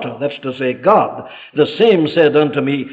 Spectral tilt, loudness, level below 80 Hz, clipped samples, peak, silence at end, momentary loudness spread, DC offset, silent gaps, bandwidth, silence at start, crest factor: -8 dB/octave; -15 LUFS; -60 dBFS; under 0.1%; 0 dBFS; 0 s; 10 LU; under 0.1%; none; 5 kHz; 0 s; 14 dB